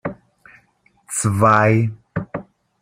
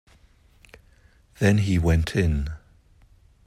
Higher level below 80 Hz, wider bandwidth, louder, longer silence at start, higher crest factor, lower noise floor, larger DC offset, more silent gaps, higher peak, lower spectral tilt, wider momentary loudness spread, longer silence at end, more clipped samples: second, -52 dBFS vs -36 dBFS; first, 15.5 kHz vs 13.5 kHz; first, -18 LUFS vs -23 LUFS; second, 0.05 s vs 1.4 s; about the same, 18 dB vs 18 dB; about the same, -59 dBFS vs -56 dBFS; neither; neither; first, -2 dBFS vs -8 dBFS; about the same, -6 dB/octave vs -7 dB/octave; first, 18 LU vs 12 LU; second, 0.4 s vs 0.9 s; neither